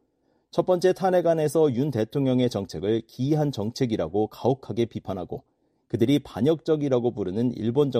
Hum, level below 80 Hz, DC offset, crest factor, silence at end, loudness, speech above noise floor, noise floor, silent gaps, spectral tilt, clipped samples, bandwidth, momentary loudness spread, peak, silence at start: none; -58 dBFS; under 0.1%; 16 dB; 0 s; -25 LUFS; 45 dB; -69 dBFS; none; -7.5 dB/octave; under 0.1%; 14.5 kHz; 7 LU; -8 dBFS; 0.55 s